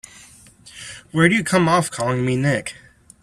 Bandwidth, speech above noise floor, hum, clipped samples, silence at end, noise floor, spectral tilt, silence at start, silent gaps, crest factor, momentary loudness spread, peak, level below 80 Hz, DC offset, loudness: 13.5 kHz; 29 dB; none; under 0.1%; 0.5 s; -47 dBFS; -5.5 dB/octave; 0.65 s; none; 20 dB; 19 LU; 0 dBFS; -54 dBFS; under 0.1%; -19 LUFS